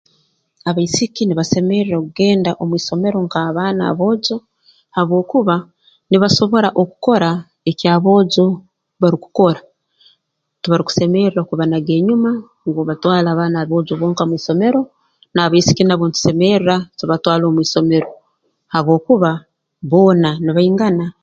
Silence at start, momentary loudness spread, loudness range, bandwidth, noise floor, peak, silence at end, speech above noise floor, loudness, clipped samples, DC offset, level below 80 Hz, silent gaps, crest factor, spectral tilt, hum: 0.65 s; 8 LU; 3 LU; 7.8 kHz; -68 dBFS; 0 dBFS; 0.1 s; 53 dB; -15 LUFS; under 0.1%; under 0.1%; -54 dBFS; none; 16 dB; -6 dB/octave; none